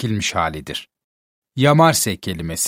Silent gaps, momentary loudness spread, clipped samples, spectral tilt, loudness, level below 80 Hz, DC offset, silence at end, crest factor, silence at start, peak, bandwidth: 1.04-1.42 s; 16 LU; under 0.1%; -4 dB/octave; -17 LUFS; -48 dBFS; under 0.1%; 0 s; 20 dB; 0 s; 0 dBFS; 16.5 kHz